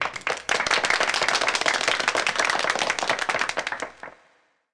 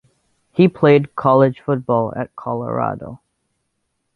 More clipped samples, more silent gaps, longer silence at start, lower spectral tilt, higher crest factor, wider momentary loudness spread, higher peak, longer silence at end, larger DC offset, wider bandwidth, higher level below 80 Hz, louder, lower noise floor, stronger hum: neither; neither; second, 0 s vs 0.55 s; second, -0.5 dB/octave vs -10 dB/octave; about the same, 18 dB vs 18 dB; about the same, 10 LU vs 12 LU; second, -8 dBFS vs -2 dBFS; second, 0.65 s vs 1 s; first, 0.1% vs under 0.1%; first, 10.5 kHz vs 4.7 kHz; about the same, -58 dBFS vs -56 dBFS; second, -23 LUFS vs -17 LUFS; second, -63 dBFS vs -72 dBFS; neither